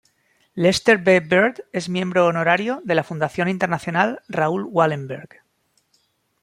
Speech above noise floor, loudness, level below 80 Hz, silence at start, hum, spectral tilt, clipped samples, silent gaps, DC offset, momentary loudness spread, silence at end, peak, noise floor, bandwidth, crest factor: 47 dB; -20 LUFS; -60 dBFS; 0.55 s; none; -5.5 dB/octave; under 0.1%; none; under 0.1%; 10 LU; 1.15 s; -2 dBFS; -67 dBFS; 15.5 kHz; 20 dB